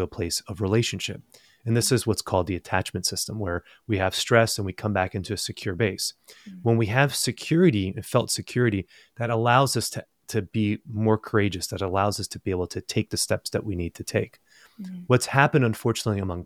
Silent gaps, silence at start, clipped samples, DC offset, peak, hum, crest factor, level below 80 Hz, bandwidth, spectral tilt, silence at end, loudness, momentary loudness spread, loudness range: none; 0 s; under 0.1%; under 0.1%; -2 dBFS; none; 22 dB; -54 dBFS; 16 kHz; -4.5 dB/octave; 0 s; -25 LUFS; 11 LU; 3 LU